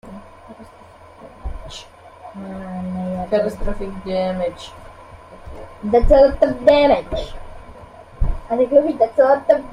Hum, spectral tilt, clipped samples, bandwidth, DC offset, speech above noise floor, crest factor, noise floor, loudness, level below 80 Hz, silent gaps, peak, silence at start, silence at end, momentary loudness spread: none; -7 dB/octave; under 0.1%; 10 kHz; under 0.1%; 27 dB; 18 dB; -44 dBFS; -18 LUFS; -30 dBFS; none; -2 dBFS; 0.05 s; 0 s; 23 LU